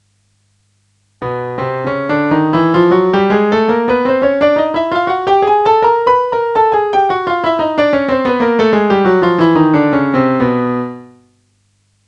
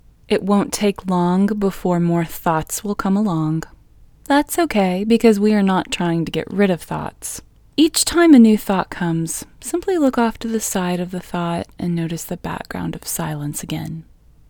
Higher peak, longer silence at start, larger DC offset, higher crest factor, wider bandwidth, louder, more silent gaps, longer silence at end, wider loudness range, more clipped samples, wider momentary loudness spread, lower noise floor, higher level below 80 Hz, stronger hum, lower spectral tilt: about the same, 0 dBFS vs 0 dBFS; first, 1.2 s vs 0.3 s; neither; second, 12 dB vs 18 dB; second, 8 kHz vs over 20 kHz; first, -12 LUFS vs -19 LUFS; neither; first, 1 s vs 0.5 s; second, 2 LU vs 7 LU; neither; second, 7 LU vs 13 LU; first, -58 dBFS vs -47 dBFS; about the same, -48 dBFS vs -44 dBFS; first, 50 Hz at -55 dBFS vs none; first, -7.5 dB/octave vs -5 dB/octave